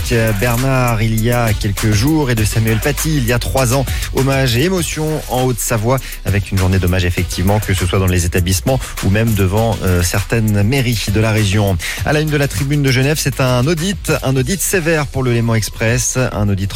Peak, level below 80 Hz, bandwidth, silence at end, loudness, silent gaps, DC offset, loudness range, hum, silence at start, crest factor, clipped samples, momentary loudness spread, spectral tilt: -2 dBFS; -26 dBFS; 17 kHz; 0 s; -15 LUFS; none; under 0.1%; 1 LU; none; 0 s; 12 dB; under 0.1%; 3 LU; -5 dB/octave